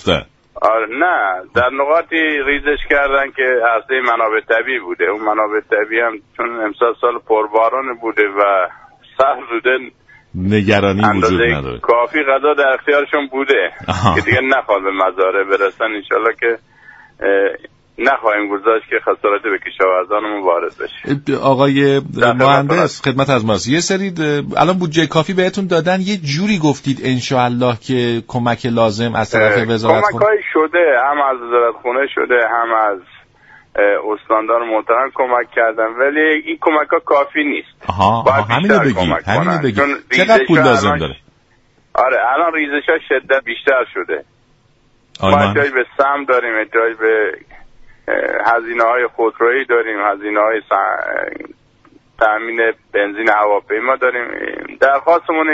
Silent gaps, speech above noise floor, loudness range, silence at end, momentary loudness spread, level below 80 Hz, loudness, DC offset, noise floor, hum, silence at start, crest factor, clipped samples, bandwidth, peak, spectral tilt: none; 39 dB; 3 LU; 0 s; 7 LU; -46 dBFS; -15 LUFS; under 0.1%; -54 dBFS; none; 0 s; 14 dB; under 0.1%; 8 kHz; 0 dBFS; -5.5 dB/octave